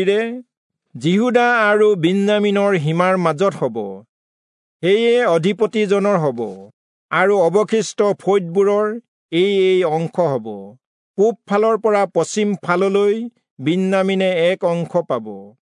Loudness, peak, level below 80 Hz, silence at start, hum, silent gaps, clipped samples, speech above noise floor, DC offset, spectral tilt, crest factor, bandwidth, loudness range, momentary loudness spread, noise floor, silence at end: -17 LUFS; -2 dBFS; -74 dBFS; 0 s; none; 0.57-0.70 s, 4.09-4.80 s, 6.73-7.09 s, 9.08-9.29 s, 10.87-11.14 s, 13.51-13.57 s; under 0.1%; over 73 dB; under 0.1%; -6 dB/octave; 16 dB; 11 kHz; 2 LU; 10 LU; under -90 dBFS; 0.1 s